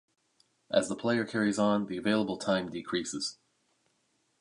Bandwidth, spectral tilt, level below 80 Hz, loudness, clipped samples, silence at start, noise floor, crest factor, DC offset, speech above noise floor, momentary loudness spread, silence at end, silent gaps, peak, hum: 11 kHz; -4.5 dB/octave; -68 dBFS; -31 LUFS; under 0.1%; 0.7 s; -74 dBFS; 20 dB; under 0.1%; 45 dB; 6 LU; 1.05 s; none; -12 dBFS; none